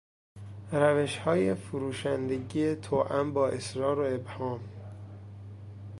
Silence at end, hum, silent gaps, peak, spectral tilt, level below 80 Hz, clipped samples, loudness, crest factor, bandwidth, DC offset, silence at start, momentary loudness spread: 0 s; none; none; -10 dBFS; -6.5 dB/octave; -58 dBFS; under 0.1%; -30 LUFS; 20 dB; 11.5 kHz; under 0.1%; 0.35 s; 19 LU